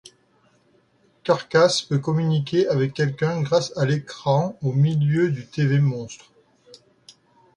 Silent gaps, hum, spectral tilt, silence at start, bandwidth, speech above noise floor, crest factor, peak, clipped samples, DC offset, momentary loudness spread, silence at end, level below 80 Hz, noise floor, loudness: none; none; -6.5 dB/octave; 1.25 s; 10.5 kHz; 40 dB; 18 dB; -6 dBFS; under 0.1%; under 0.1%; 6 LU; 1.4 s; -60 dBFS; -61 dBFS; -22 LUFS